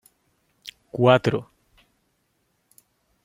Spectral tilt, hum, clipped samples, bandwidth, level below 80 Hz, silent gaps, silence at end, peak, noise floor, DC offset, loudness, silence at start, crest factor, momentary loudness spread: -7 dB/octave; none; under 0.1%; 16 kHz; -62 dBFS; none; 1.85 s; -2 dBFS; -71 dBFS; under 0.1%; -21 LUFS; 0.65 s; 24 dB; 25 LU